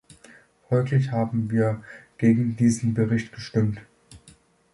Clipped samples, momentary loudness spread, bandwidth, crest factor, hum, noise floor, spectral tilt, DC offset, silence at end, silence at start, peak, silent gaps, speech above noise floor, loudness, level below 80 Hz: under 0.1%; 7 LU; 11.5 kHz; 16 dB; none; -55 dBFS; -7.5 dB/octave; under 0.1%; 0.45 s; 0.7 s; -8 dBFS; none; 33 dB; -24 LUFS; -56 dBFS